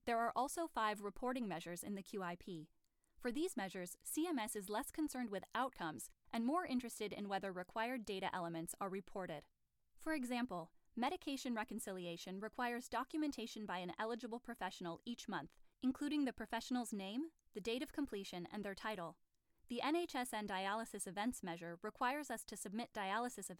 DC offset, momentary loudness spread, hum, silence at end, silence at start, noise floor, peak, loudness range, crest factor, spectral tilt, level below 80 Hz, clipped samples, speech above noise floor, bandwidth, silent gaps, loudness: under 0.1%; 8 LU; none; 0.05 s; 0.05 s; -66 dBFS; -26 dBFS; 2 LU; 18 dB; -4 dB/octave; -72 dBFS; under 0.1%; 22 dB; 18.5 kHz; none; -44 LUFS